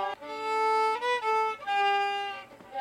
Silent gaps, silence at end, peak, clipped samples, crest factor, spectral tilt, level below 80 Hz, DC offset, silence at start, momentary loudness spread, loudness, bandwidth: none; 0 s; -18 dBFS; under 0.1%; 12 dB; -1.5 dB/octave; -74 dBFS; under 0.1%; 0 s; 11 LU; -28 LUFS; 14 kHz